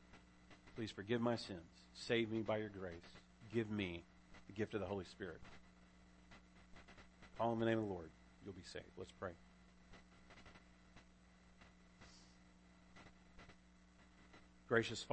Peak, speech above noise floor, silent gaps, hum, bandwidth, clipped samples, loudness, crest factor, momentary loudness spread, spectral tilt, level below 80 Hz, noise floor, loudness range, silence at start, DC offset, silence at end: -20 dBFS; 24 dB; none; none; 8.4 kHz; under 0.1%; -44 LUFS; 26 dB; 26 LU; -5.5 dB/octave; -70 dBFS; -67 dBFS; 21 LU; 0 s; under 0.1%; 0 s